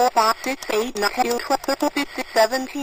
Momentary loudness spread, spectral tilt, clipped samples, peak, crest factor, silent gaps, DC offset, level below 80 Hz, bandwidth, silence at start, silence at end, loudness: 5 LU; -2 dB/octave; under 0.1%; -4 dBFS; 18 dB; none; 0.3%; -52 dBFS; 15.5 kHz; 0 s; 0 s; -21 LUFS